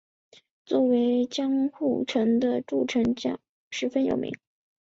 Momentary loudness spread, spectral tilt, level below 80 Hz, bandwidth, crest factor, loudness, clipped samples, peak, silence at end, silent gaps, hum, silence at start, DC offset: 10 LU; -5.5 dB/octave; -64 dBFS; 7.8 kHz; 14 dB; -26 LUFS; under 0.1%; -12 dBFS; 0.5 s; 3.49-3.71 s; none; 0.7 s; under 0.1%